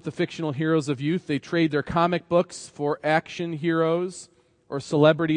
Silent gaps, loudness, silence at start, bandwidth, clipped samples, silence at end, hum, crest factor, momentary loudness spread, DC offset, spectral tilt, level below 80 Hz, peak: none; -24 LUFS; 0.05 s; 10 kHz; under 0.1%; 0 s; none; 20 dB; 11 LU; under 0.1%; -6.5 dB/octave; -58 dBFS; -4 dBFS